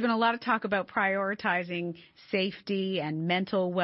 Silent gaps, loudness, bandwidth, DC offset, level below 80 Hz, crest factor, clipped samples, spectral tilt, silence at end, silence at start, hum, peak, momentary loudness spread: none; -29 LUFS; 5.8 kHz; under 0.1%; -72 dBFS; 16 dB; under 0.1%; -9 dB/octave; 0 s; 0 s; none; -14 dBFS; 7 LU